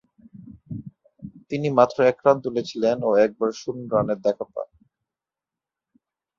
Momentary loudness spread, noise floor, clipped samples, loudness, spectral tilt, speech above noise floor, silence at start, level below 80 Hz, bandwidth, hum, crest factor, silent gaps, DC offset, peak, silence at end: 19 LU; -89 dBFS; under 0.1%; -22 LUFS; -6.5 dB/octave; 68 dB; 0.35 s; -62 dBFS; 7.4 kHz; none; 22 dB; none; under 0.1%; -2 dBFS; 1.75 s